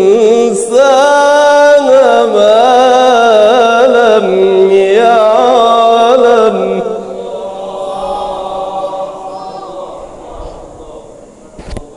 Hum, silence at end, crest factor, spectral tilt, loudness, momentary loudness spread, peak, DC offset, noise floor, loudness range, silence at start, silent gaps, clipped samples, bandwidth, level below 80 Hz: none; 0.1 s; 8 dB; -4 dB/octave; -8 LUFS; 18 LU; 0 dBFS; under 0.1%; -34 dBFS; 15 LU; 0 s; none; 2%; 12 kHz; -40 dBFS